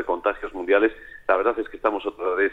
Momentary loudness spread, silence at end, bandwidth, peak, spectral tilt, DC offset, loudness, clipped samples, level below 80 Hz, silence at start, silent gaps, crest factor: 7 LU; 0 s; 4.5 kHz; -4 dBFS; -6 dB/octave; under 0.1%; -24 LUFS; under 0.1%; -52 dBFS; 0 s; none; 18 dB